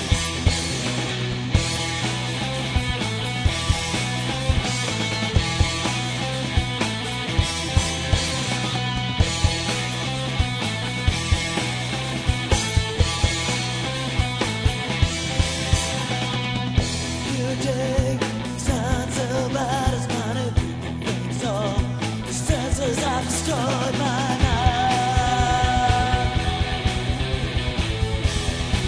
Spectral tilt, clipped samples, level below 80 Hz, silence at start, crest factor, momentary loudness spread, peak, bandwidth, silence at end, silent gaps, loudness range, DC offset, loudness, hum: -4 dB/octave; under 0.1%; -30 dBFS; 0 s; 20 dB; 4 LU; -4 dBFS; 11 kHz; 0 s; none; 3 LU; under 0.1%; -23 LUFS; none